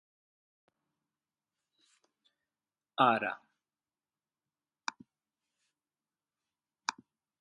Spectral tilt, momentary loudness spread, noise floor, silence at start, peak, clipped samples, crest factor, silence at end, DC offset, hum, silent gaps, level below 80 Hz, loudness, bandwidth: -3.5 dB/octave; 16 LU; under -90 dBFS; 3 s; -12 dBFS; under 0.1%; 28 dB; 0.5 s; under 0.1%; none; none; -88 dBFS; -33 LUFS; 10.5 kHz